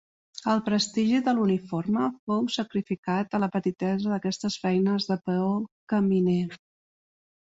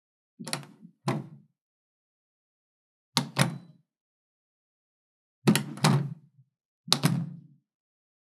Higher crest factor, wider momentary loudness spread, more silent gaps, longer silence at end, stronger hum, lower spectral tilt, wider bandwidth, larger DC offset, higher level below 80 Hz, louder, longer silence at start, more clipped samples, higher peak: second, 16 dB vs 32 dB; second, 6 LU vs 20 LU; second, 2.19-2.27 s, 2.98-3.03 s, 5.72-5.87 s vs 1.61-3.12 s, 4.01-5.42 s, 6.65-6.84 s; about the same, 1 s vs 0.9 s; neither; first, -6 dB/octave vs -4.5 dB/octave; second, 8 kHz vs 15 kHz; neither; first, -66 dBFS vs under -90 dBFS; about the same, -27 LUFS vs -29 LUFS; about the same, 0.35 s vs 0.4 s; neither; second, -12 dBFS vs 0 dBFS